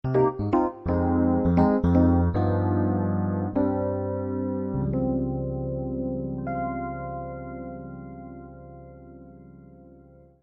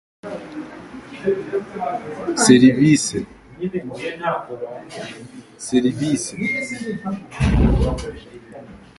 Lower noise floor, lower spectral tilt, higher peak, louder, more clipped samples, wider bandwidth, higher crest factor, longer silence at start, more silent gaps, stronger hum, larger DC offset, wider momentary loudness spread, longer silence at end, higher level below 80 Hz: first, -52 dBFS vs -40 dBFS; first, -12 dB/octave vs -5 dB/octave; second, -8 dBFS vs 0 dBFS; second, -25 LUFS vs -19 LUFS; neither; second, 5.4 kHz vs 11.5 kHz; about the same, 18 dB vs 20 dB; second, 0.05 s vs 0.25 s; neither; neither; neither; about the same, 20 LU vs 22 LU; first, 0.45 s vs 0.2 s; second, -42 dBFS vs -32 dBFS